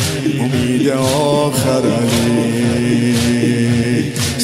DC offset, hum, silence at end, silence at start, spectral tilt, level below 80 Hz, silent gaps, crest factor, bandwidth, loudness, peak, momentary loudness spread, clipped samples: under 0.1%; none; 0 s; 0 s; -5.5 dB/octave; -42 dBFS; none; 12 dB; 16 kHz; -15 LUFS; -4 dBFS; 2 LU; under 0.1%